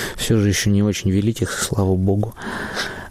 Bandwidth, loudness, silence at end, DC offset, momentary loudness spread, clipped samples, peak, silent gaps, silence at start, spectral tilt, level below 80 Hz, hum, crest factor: 15.5 kHz; -20 LUFS; 0 s; under 0.1%; 9 LU; under 0.1%; -8 dBFS; none; 0 s; -5 dB/octave; -40 dBFS; none; 12 dB